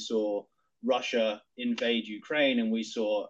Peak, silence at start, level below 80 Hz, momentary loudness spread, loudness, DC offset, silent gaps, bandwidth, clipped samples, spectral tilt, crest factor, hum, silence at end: -14 dBFS; 0 s; -80 dBFS; 8 LU; -30 LUFS; under 0.1%; none; 8 kHz; under 0.1%; -4 dB/octave; 16 dB; none; 0 s